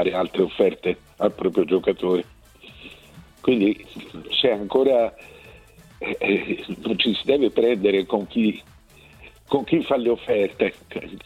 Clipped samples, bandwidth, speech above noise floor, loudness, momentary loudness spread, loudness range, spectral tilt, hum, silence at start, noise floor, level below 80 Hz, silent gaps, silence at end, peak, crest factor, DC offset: under 0.1%; 13.5 kHz; 28 dB; -22 LUFS; 15 LU; 2 LU; -6.5 dB/octave; none; 0 s; -50 dBFS; -54 dBFS; none; 0.05 s; -6 dBFS; 18 dB; under 0.1%